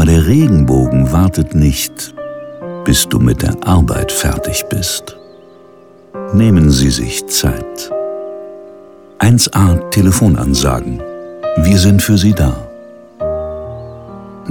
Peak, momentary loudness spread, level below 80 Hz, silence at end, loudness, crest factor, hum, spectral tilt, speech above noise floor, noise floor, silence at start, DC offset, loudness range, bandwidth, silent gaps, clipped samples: 0 dBFS; 18 LU; -24 dBFS; 0 s; -12 LUFS; 12 dB; none; -5.5 dB/octave; 29 dB; -40 dBFS; 0 s; under 0.1%; 3 LU; 18.5 kHz; none; under 0.1%